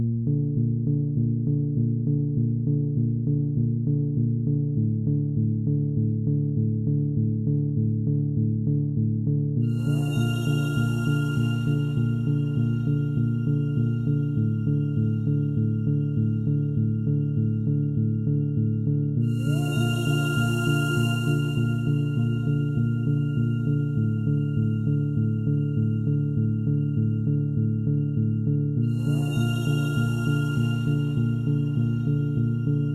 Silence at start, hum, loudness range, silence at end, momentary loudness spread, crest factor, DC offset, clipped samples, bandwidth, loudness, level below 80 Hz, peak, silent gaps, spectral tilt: 0 s; none; 1 LU; 0 s; 1 LU; 12 dB; under 0.1%; under 0.1%; 13 kHz; -25 LUFS; -50 dBFS; -12 dBFS; none; -8 dB/octave